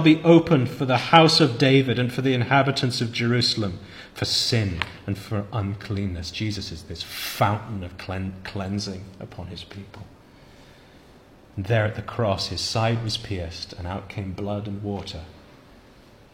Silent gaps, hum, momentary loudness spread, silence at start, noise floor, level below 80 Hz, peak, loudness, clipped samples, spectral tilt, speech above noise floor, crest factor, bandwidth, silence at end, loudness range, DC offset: none; none; 20 LU; 0 s; -50 dBFS; -50 dBFS; 0 dBFS; -23 LUFS; under 0.1%; -5.5 dB/octave; 27 dB; 24 dB; 16.5 kHz; 0.95 s; 14 LU; under 0.1%